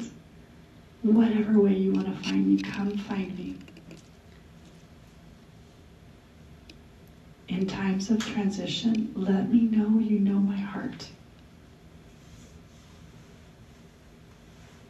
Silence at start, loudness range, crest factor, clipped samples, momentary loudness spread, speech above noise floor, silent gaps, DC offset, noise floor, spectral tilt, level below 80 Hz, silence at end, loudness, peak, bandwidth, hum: 0 s; 15 LU; 18 dB; under 0.1%; 17 LU; 27 dB; none; under 0.1%; -52 dBFS; -7 dB/octave; -58 dBFS; 0.25 s; -26 LUFS; -12 dBFS; 8.2 kHz; none